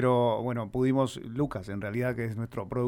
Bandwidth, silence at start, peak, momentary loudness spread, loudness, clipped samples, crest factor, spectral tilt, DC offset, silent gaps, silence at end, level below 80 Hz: 16.5 kHz; 0 s; -14 dBFS; 8 LU; -30 LUFS; under 0.1%; 14 dB; -7.5 dB/octave; under 0.1%; none; 0 s; -56 dBFS